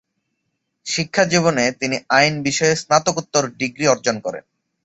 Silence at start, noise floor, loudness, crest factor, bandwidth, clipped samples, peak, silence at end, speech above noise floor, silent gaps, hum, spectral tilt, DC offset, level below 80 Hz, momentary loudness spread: 0.85 s; -74 dBFS; -18 LUFS; 20 dB; 8.4 kHz; under 0.1%; 0 dBFS; 0.45 s; 56 dB; none; none; -3.5 dB/octave; under 0.1%; -58 dBFS; 9 LU